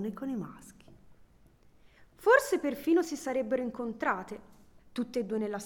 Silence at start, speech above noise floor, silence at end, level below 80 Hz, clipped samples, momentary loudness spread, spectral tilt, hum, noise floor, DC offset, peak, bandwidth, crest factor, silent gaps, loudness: 0 s; 30 dB; 0 s; -64 dBFS; under 0.1%; 18 LU; -5 dB/octave; none; -61 dBFS; under 0.1%; -10 dBFS; 18 kHz; 22 dB; none; -31 LUFS